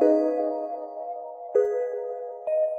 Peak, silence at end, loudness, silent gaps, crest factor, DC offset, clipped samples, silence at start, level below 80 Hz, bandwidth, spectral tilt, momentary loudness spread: -8 dBFS; 0 s; -28 LUFS; none; 16 dB; under 0.1%; under 0.1%; 0 s; -80 dBFS; 7.8 kHz; -6.5 dB/octave; 12 LU